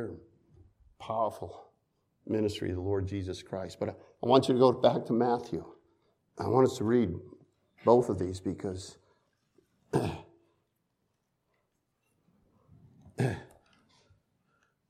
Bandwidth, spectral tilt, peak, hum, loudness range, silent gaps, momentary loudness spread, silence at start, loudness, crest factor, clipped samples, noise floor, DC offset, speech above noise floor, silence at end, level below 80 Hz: 13.5 kHz; -7 dB/octave; -8 dBFS; none; 14 LU; none; 18 LU; 0 s; -30 LUFS; 24 dB; under 0.1%; -79 dBFS; under 0.1%; 50 dB; 1.45 s; -64 dBFS